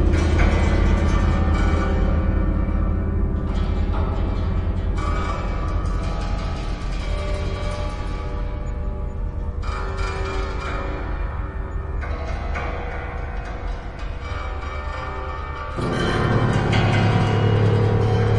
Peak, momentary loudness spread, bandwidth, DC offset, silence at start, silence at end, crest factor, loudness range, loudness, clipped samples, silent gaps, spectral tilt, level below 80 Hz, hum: -4 dBFS; 11 LU; 9.8 kHz; under 0.1%; 0 s; 0 s; 16 dB; 8 LU; -24 LUFS; under 0.1%; none; -7 dB/octave; -24 dBFS; none